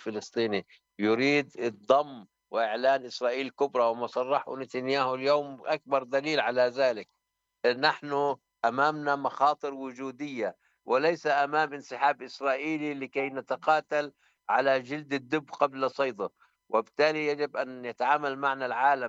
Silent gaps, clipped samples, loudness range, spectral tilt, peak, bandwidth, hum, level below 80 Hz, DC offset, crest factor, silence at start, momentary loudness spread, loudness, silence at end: none; under 0.1%; 2 LU; -5 dB/octave; -8 dBFS; 8 kHz; none; -82 dBFS; under 0.1%; 20 dB; 0 s; 9 LU; -29 LUFS; 0 s